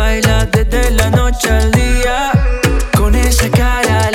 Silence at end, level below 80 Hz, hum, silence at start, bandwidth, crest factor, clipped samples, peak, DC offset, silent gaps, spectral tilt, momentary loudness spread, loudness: 0 s; -14 dBFS; none; 0 s; 18 kHz; 10 dB; under 0.1%; 0 dBFS; under 0.1%; none; -5 dB/octave; 2 LU; -13 LUFS